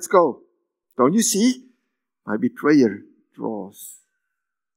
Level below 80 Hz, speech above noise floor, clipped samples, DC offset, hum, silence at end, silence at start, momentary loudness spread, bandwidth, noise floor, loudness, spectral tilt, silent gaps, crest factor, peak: -82 dBFS; 63 dB; under 0.1%; under 0.1%; none; 0.85 s; 0 s; 22 LU; 16 kHz; -83 dBFS; -20 LUFS; -4 dB/octave; none; 22 dB; 0 dBFS